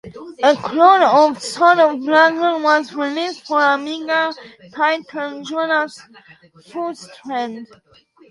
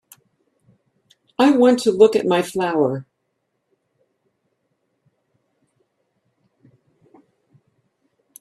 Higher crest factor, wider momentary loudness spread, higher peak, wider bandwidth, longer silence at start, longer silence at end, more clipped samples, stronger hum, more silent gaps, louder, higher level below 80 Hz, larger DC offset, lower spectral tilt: about the same, 18 dB vs 22 dB; first, 15 LU vs 9 LU; about the same, 0 dBFS vs 0 dBFS; second, 11.5 kHz vs 13.5 kHz; second, 0.05 s vs 1.4 s; second, 0.65 s vs 5.4 s; neither; neither; neither; about the same, -16 LUFS vs -17 LUFS; about the same, -66 dBFS vs -68 dBFS; neither; second, -3.5 dB/octave vs -5.5 dB/octave